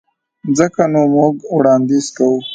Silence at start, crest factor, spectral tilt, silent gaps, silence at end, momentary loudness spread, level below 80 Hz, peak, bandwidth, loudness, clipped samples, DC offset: 0.45 s; 14 dB; -6 dB/octave; none; 0 s; 5 LU; -58 dBFS; 0 dBFS; 9.2 kHz; -14 LUFS; under 0.1%; under 0.1%